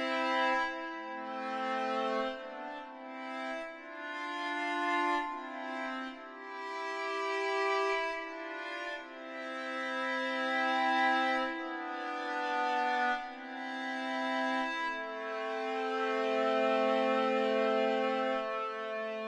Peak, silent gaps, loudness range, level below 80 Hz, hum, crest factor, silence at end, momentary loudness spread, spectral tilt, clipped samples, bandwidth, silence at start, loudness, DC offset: -18 dBFS; none; 5 LU; -76 dBFS; none; 16 dB; 0 s; 12 LU; -3 dB/octave; under 0.1%; 11 kHz; 0 s; -34 LUFS; under 0.1%